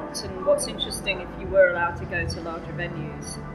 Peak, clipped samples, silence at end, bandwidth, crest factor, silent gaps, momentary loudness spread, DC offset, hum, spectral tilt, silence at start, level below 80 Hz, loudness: -6 dBFS; under 0.1%; 0 s; 13.5 kHz; 18 dB; none; 13 LU; under 0.1%; none; -4 dB/octave; 0 s; -44 dBFS; -26 LUFS